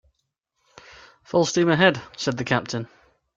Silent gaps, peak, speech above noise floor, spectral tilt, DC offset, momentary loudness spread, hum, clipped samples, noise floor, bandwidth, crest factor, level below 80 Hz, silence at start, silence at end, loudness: none; -4 dBFS; 55 dB; -4.5 dB/octave; under 0.1%; 14 LU; none; under 0.1%; -76 dBFS; 7.8 kHz; 20 dB; -60 dBFS; 1.35 s; 0.5 s; -22 LUFS